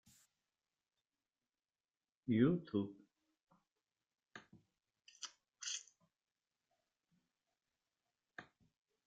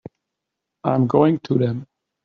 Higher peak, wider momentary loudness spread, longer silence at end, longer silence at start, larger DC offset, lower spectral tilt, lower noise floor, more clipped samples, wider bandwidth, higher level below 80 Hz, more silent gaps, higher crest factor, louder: second, -22 dBFS vs -2 dBFS; first, 25 LU vs 10 LU; first, 0.65 s vs 0.4 s; first, 2.25 s vs 0.85 s; neither; second, -5.5 dB/octave vs -8.5 dB/octave; first, under -90 dBFS vs -82 dBFS; neither; first, 9 kHz vs 6.8 kHz; second, -82 dBFS vs -62 dBFS; neither; first, 26 dB vs 20 dB; second, -41 LUFS vs -20 LUFS